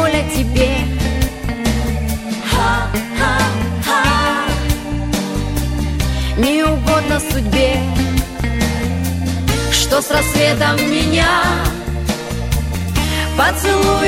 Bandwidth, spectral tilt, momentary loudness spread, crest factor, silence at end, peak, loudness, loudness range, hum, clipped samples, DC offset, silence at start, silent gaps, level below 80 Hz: 16.5 kHz; -4.5 dB/octave; 7 LU; 14 dB; 0 s; -2 dBFS; -16 LUFS; 2 LU; none; under 0.1%; under 0.1%; 0 s; none; -22 dBFS